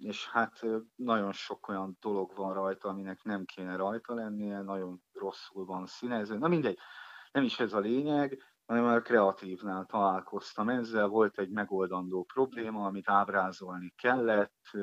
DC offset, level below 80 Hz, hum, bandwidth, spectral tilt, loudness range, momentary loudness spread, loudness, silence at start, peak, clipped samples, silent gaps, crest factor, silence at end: under 0.1%; -82 dBFS; none; 8 kHz; -6.5 dB/octave; 7 LU; 12 LU; -33 LUFS; 0 s; -12 dBFS; under 0.1%; none; 22 dB; 0 s